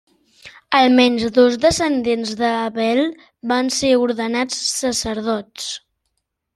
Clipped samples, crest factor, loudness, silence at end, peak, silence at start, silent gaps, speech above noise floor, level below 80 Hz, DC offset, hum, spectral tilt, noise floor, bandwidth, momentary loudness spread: under 0.1%; 16 dB; -18 LUFS; 0.8 s; -2 dBFS; 0.45 s; none; 56 dB; -50 dBFS; under 0.1%; none; -3 dB/octave; -74 dBFS; 13 kHz; 11 LU